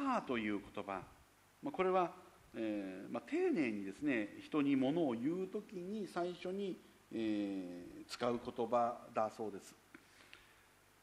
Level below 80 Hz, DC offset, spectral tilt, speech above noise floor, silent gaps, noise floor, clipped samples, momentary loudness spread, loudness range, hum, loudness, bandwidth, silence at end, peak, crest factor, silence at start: -74 dBFS; under 0.1%; -6 dB/octave; 28 dB; none; -68 dBFS; under 0.1%; 17 LU; 4 LU; none; -40 LUFS; 14.5 kHz; 0.65 s; -20 dBFS; 20 dB; 0 s